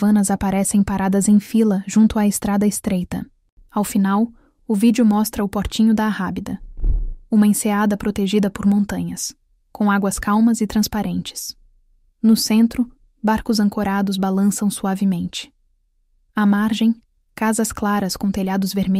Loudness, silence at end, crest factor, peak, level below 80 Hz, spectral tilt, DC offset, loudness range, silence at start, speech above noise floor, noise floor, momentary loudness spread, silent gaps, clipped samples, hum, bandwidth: -19 LUFS; 0 s; 14 dB; -6 dBFS; -36 dBFS; -5.5 dB/octave; under 0.1%; 3 LU; 0 s; 44 dB; -62 dBFS; 11 LU; 3.52-3.57 s; under 0.1%; none; 15.5 kHz